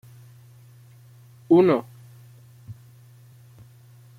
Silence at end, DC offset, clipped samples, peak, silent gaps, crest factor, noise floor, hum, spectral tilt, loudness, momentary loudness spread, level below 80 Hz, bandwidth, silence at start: 1.45 s; under 0.1%; under 0.1%; -8 dBFS; none; 20 dB; -50 dBFS; none; -8.5 dB/octave; -19 LUFS; 29 LU; -68 dBFS; 15 kHz; 1.5 s